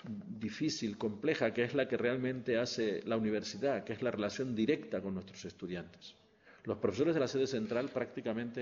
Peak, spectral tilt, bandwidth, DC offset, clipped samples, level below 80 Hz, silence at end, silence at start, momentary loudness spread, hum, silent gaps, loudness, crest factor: -16 dBFS; -5 dB/octave; 7.4 kHz; under 0.1%; under 0.1%; -72 dBFS; 0 s; 0.05 s; 11 LU; none; none; -36 LUFS; 20 dB